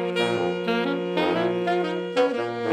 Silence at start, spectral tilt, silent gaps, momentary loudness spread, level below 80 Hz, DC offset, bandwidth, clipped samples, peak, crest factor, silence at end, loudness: 0 s; -6 dB/octave; none; 2 LU; -70 dBFS; under 0.1%; 12.5 kHz; under 0.1%; -8 dBFS; 16 dB; 0 s; -24 LUFS